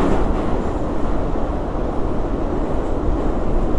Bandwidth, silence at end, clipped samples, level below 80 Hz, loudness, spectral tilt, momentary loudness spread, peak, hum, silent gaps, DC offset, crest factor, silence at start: 8.2 kHz; 0 s; under 0.1%; -22 dBFS; -23 LUFS; -8.5 dB/octave; 3 LU; -4 dBFS; none; none; under 0.1%; 12 dB; 0 s